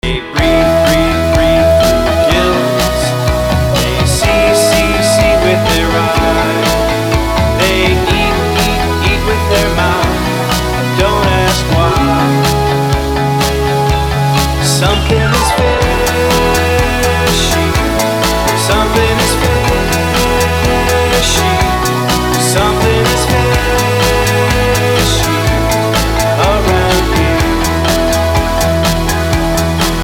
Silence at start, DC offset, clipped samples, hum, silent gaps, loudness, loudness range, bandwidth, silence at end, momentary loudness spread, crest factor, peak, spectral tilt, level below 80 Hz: 0.05 s; under 0.1%; under 0.1%; none; none; -11 LUFS; 1 LU; over 20 kHz; 0 s; 3 LU; 10 dB; 0 dBFS; -4.5 dB/octave; -20 dBFS